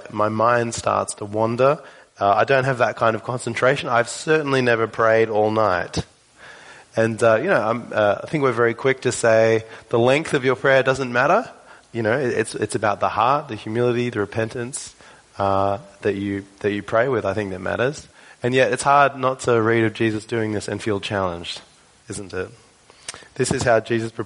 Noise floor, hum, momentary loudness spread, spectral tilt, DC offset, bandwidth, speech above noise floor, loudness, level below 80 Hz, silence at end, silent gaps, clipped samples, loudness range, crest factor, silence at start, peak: -46 dBFS; none; 12 LU; -5 dB/octave; under 0.1%; 11 kHz; 26 dB; -20 LUFS; -54 dBFS; 0 s; none; under 0.1%; 5 LU; 18 dB; 0 s; -2 dBFS